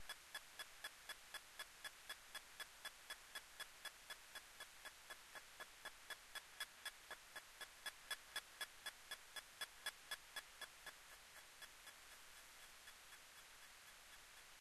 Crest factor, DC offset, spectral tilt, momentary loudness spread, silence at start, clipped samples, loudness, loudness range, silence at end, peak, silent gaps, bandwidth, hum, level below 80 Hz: 22 dB; under 0.1%; 1 dB/octave; 9 LU; 0 s; under 0.1%; -55 LUFS; 7 LU; 0 s; -34 dBFS; none; 13 kHz; none; -80 dBFS